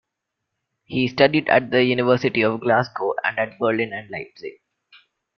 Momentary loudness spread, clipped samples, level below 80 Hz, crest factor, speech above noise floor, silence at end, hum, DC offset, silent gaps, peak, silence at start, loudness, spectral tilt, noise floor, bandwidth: 15 LU; under 0.1%; -62 dBFS; 20 dB; 60 dB; 0.85 s; none; under 0.1%; none; -2 dBFS; 0.9 s; -20 LUFS; -7 dB/octave; -81 dBFS; 6.4 kHz